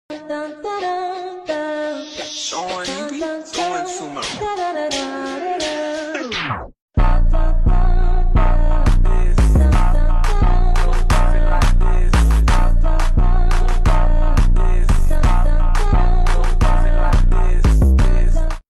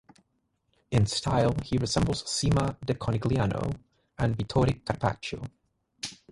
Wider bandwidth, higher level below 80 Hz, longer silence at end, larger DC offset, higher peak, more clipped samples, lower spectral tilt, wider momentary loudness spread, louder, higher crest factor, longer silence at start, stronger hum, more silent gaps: second, 10 kHz vs 11.5 kHz; first, -14 dBFS vs -44 dBFS; about the same, 0.1 s vs 0.15 s; neither; about the same, -6 dBFS vs -8 dBFS; neither; about the same, -5.5 dB/octave vs -5.5 dB/octave; second, 9 LU vs 13 LU; first, -19 LUFS vs -28 LUFS; second, 6 dB vs 20 dB; second, 0.1 s vs 0.9 s; neither; first, 6.82-6.88 s vs none